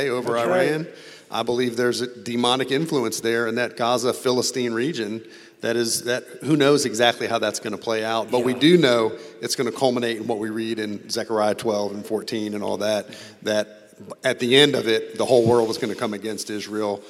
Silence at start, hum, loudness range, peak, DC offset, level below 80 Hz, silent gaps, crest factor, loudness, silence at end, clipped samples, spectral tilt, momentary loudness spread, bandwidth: 0 s; none; 5 LU; -2 dBFS; under 0.1%; -72 dBFS; none; 20 dB; -22 LUFS; 0 s; under 0.1%; -4 dB/octave; 11 LU; 16 kHz